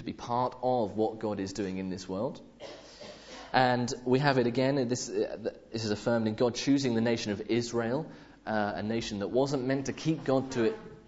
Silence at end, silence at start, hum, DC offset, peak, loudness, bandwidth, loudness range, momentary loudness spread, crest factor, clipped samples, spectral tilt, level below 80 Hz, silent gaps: 0.05 s; 0 s; none; under 0.1%; -8 dBFS; -30 LUFS; 8 kHz; 4 LU; 14 LU; 22 dB; under 0.1%; -5.5 dB/octave; -62 dBFS; none